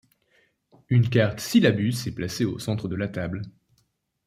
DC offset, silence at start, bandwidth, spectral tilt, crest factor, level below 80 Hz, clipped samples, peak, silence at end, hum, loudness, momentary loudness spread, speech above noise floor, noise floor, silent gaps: under 0.1%; 0.9 s; 16 kHz; -6 dB/octave; 20 dB; -58 dBFS; under 0.1%; -6 dBFS; 0.75 s; none; -24 LUFS; 11 LU; 47 dB; -71 dBFS; none